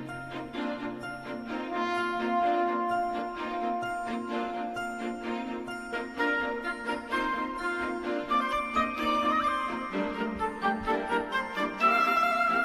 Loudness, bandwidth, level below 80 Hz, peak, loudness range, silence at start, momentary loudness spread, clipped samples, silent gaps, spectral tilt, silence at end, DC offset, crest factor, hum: -30 LUFS; 14 kHz; -56 dBFS; -14 dBFS; 5 LU; 0 s; 10 LU; under 0.1%; none; -4.5 dB/octave; 0 s; under 0.1%; 16 dB; none